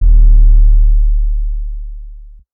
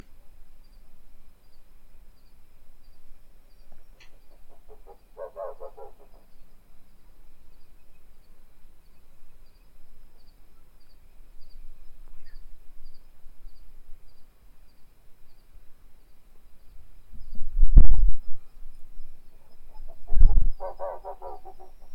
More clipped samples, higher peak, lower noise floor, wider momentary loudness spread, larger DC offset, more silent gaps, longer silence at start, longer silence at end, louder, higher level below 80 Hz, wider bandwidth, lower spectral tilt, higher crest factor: neither; about the same, 0 dBFS vs 0 dBFS; second, -32 dBFS vs -46 dBFS; second, 19 LU vs 30 LU; neither; neither; second, 0 s vs 2.95 s; first, 0.3 s vs 0 s; first, -14 LUFS vs -29 LUFS; first, -8 dBFS vs -28 dBFS; second, 0.4 kHz vs 1.3 kHz; first, -14.5 dB/octave vs -9 dB/octave; second, 8 dB vs 20 dB